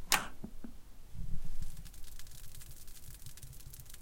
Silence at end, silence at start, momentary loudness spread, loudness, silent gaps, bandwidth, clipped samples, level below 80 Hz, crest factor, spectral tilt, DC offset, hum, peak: 0 s; 0 s; 9 LU; -44 LUFS; none; 17 kHz; under 0.1%; -44 dBFS; 26 dB; -1.5 dB/octave; under 0.1%; none; -10 dBFS